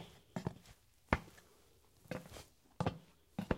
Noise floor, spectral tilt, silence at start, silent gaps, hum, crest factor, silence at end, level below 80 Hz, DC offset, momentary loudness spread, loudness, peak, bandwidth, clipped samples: -69 dBFS; -6.5 dB/octave; 0 s; none; none; 32 dB; 0 s; -56 dBFS; under 0.1%; 21 LU; -44 LUFS; -12 dBFS; 16 kHz; under 0.1%